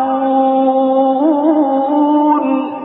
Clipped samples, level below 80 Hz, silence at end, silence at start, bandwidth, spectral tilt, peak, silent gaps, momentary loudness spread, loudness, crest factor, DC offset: under 0.1%; -64 dBFS; 0 s; 0 s; 4 kHz; -11 dB/octave; -2 dBFS; none; 2 LU; -13 LUFS; 10 dB; under 0.1%